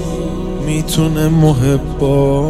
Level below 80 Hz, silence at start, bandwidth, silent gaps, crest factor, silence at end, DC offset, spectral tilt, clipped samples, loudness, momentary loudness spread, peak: -24 dBFS; 0 s; 15 kHz; none; 12 dB; 0 s; under 0.1%; -7 dB/octave; under 0.1%; -14 LUFS; 9 LU; -2 dBFS